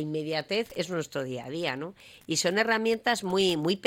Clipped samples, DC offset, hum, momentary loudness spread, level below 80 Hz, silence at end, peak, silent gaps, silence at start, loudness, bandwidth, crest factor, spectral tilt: under 0.1%; under 0.1%; none; 10 LU; -66 dBFS; 0 s; -10 dBFS; none; 0 s; -28 LUFS; 16.5 kHz; 18 dB; -3.5 dB/octave